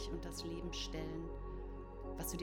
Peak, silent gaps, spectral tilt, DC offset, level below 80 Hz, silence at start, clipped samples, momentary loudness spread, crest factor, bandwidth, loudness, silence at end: -30 dBFS; none; -4.5 dB/octave; under 0.1%; -48 dBFS; 0 s; under 0.1%; 6 LU; 14 dB; 19 kHz; -45 LUFS; 0 s